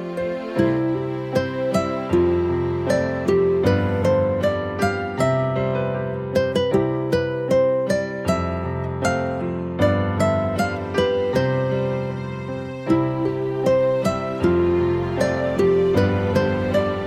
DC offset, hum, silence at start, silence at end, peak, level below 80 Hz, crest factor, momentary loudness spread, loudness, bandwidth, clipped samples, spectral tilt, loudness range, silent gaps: under 0.1%; none; 0 s; 0 s; -4 dBFS; -44 dBFS; 16 dB; 6 LU; -21 LUFS; 15.5 kHz; under 0.1%; -7 dB/octave; 2 LU; none